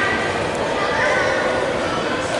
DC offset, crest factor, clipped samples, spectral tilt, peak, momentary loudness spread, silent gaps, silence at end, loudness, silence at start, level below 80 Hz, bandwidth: under 0.1%; 12 dB; under 0.1%; -4 dB/octave; -8 dBFS; 4 LU; none; 0 s; -19 LUFS; 0 s; -44 dBFS; 11.5 kHz